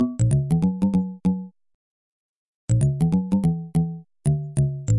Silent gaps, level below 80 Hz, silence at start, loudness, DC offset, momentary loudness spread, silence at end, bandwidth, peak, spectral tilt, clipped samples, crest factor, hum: 1.75-2.68 s; -44 dBFS; 0 s; -23 LUFS; under 0.1%; 8 LU; 0 s; 11.5 kHz; -10 dBFS; -8.5 dB/octave; under 0.1%; 12 dB; none